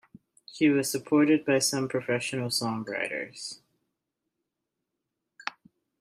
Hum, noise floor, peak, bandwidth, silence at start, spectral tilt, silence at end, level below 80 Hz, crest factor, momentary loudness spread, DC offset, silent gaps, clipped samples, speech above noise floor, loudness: none; -85 dBFS; -12 dBFS; 15.5 kHz; 0.5 s; -4 dB/octave; 0.5 s; -74 dBFS; 18 dB; 16 LU; under 0.1%; none; under 0.1%; 58 dB; -27 LUFS